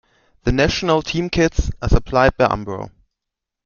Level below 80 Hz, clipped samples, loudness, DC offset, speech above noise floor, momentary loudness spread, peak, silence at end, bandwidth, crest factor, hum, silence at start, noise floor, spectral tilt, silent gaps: -26 dBFS; under 0.1%; -18 LUFS; under 0.1%; 65 dB; 11 LU; 0 dBFS; 0.75 s; 7.2 kHz; 18 dB; none; 0.45 s; -83 dBFS; -5.5 dB/octave; none